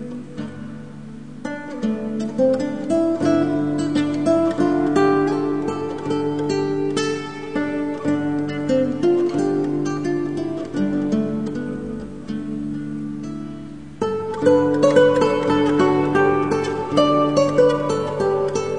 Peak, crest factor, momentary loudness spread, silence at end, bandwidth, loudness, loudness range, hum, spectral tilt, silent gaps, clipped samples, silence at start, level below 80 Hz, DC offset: -2 dBFS; 18 dB; 14 LU; 0 s; 10 kHz; -20 LUFS; 7 LU; none; -6.5 dB/octave; none; under 0.1%; 0 s; -52 dBFS; 0.6%